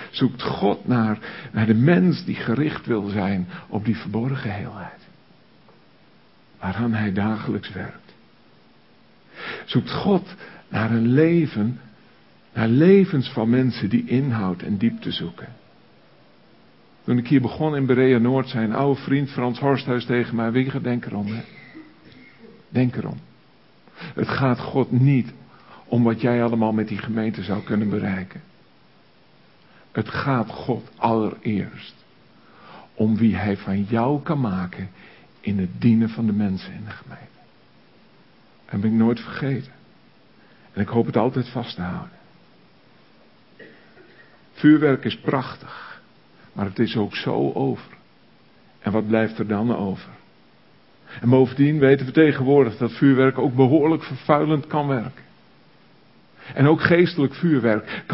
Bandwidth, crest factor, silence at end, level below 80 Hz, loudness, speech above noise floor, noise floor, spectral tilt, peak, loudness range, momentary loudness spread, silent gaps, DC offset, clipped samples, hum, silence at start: 5.8 kHz; 22 dB; 0 s; -54 dBFS; -21 LUFS; 35 dB; -55 dBFS; -12 dB/octave; 0 dBFS; 9 LU; 17 LU; none; 0.1%; under 0.1%; none; 0 s